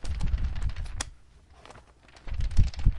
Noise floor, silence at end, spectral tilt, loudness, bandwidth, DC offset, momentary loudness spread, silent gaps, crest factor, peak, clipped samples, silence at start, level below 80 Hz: -54 dBFS; 0 s; -5 dB/octave; -33 LUFS; 11 kHz; under 0.1%; 22 LU; none; 20 dB; -6 dBFS; under 0.1%; 0.05 s; -30 dBFS